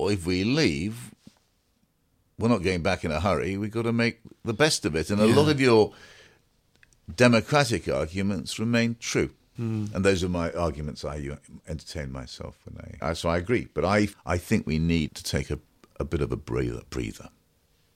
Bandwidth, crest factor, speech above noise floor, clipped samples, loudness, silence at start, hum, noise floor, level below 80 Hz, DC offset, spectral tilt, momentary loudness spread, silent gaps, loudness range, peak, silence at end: 15.5 kHz; 22 dB; 43 dB; under 0.1%; -26 LUFS; 0 s; none; -69 dBFS; -44 dBFS; under 0.1%; -5.5 dB/octave; 16 LU; none; 7 LU; -4 dBFS; 0.7 s